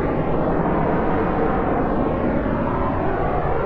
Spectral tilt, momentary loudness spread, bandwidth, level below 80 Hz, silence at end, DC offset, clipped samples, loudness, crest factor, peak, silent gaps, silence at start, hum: -10.5 dB/octave; 2 LU; 5.4 kHz; -30 dBFS; 0 s; under 0.1%; under 0.1%; -21 LUFS; 12 dB; -8 dBFS; none; 0 s; none